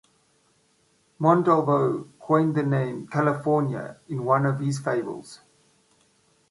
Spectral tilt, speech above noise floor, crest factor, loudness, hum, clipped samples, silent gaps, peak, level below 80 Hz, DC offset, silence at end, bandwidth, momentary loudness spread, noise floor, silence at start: -8 dB/octave; 42 dB; 20 dB; -24 LUFS; none; under 0.1%; none; -6 dBFS; -68 dBFS; under 0.1%; 1.15 s; 11.5 kHz; 12 LU; -65 dBFS; 1.2 s